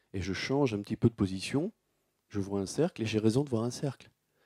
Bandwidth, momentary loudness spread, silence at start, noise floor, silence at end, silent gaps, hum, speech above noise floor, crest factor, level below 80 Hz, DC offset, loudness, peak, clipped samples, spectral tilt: 14 kHz; 10 LU; 0.15 s; -78 dBFS; 0.4 s; none; none; 46 dB; 22 dB; -64 dBFS; under 0.1%; -32 LUFS; -12 dBFS; under 0.1%; -6 dB/octave